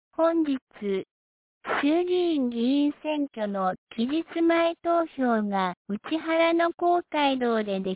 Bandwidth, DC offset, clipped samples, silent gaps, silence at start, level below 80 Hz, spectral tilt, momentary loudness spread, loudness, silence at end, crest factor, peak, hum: 4 kHz; under 0.1%; under 0.1%; 0.62-0.67 s, 1.11-1.61 s, 3.78-3.87 s, 5.77-5.85 s, 6.74-6.78 s; 0.2 s; -68 dBFS; -9.5 dB/octave; 8 LU; -26 LUFS; 0 s; 12 dB; -12 dBFS; none